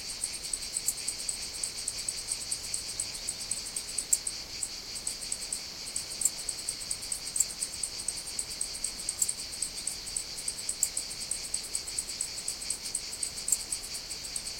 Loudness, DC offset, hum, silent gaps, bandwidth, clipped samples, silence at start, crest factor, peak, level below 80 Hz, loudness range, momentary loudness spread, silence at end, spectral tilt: -32 LUFS; under 0.1%; none; none; 17 kHz; under 0.1%; 0 s; 28 dB; -8 dBFS; -56 dBFS; 1 LU; 6 LU; 0 s; 1 dB/octave